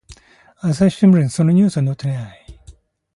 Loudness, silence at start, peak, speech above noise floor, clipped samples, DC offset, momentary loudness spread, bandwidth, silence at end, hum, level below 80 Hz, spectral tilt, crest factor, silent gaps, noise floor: -16 LUFS; 0.1 s; -4 dBFS; 31 dB; under 0.1%; under 0.1%; 12 LU; 11.5 kHz; 0.45 s; none; -48 dBFS; -7.5 dB/octave; 14 dB; none; -46 dBFS